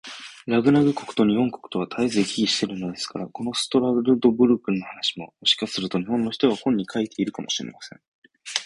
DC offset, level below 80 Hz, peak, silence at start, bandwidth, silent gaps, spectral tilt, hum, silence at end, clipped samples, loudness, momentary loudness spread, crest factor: under 0.1%; -60 dBFS; 0 dBFS; 0.05 s; 11.5 kHz; 8.08-8.22 s; -4.5 dB/octave; none; 0 s; under 0.1%; -23 LUFS; 11 LU; 22 dB